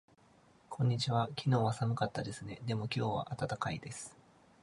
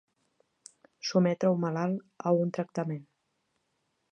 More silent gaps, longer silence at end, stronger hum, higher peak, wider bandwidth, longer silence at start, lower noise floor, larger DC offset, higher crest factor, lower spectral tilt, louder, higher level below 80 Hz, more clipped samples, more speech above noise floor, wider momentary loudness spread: neither; second, 0.5 s vs 1.1 s; neither; second, -18 dBFS vs -12 dBFS; first, 11.5 kHz vs 9.4 kHz; second, 0.7 s vs 1.05 s; second, -65 dBFS vs -78 dBFS; neither; about the same, 18 dB vs 20 dB; about the same, -6 dB/octave vs -7 dB/octave; second, -36 LUFS vs -30 LUFS; first, -64 dBFS vs -80 dBFS; neither; second, 30 dB vs 49 dB; about the same, 12 LU vs 10 LU